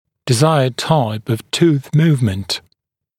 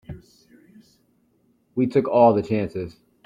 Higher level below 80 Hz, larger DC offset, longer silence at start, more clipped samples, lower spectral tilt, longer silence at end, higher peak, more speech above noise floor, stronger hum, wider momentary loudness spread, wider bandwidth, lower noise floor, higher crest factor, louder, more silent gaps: about the same, -54 dBFS vs -58 dBFS; neither; first, 0.25 s vs 0.1 s; neither; second, -6 dB/octave vs -9 dB/octave; first, 0.6 s vs 0.35 s; about the same, 0 dBFS vs -2 dBFS; first, 54 dB vs 44 dB; neither; second, 8 LU vs 22 LU; first, 16 kHz vs 9.6 kHz; first, -69 dBFS vs -64 dBFS; about the same, 16 dB vs 20 dB; first, -16 LUFS vs -21 LUFS; neither